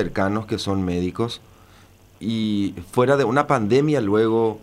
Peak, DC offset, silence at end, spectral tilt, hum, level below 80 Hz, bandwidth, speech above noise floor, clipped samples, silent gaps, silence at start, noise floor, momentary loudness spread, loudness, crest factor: -4 dBFS; under 0.1%; 0 s; -6.5 dB/octave; none; -50 dBFS; 15 kHz; 30 dB; under 0.1%; none; 0 s; -50 dBFS; 9 LU; -21 LUFS; 18 dB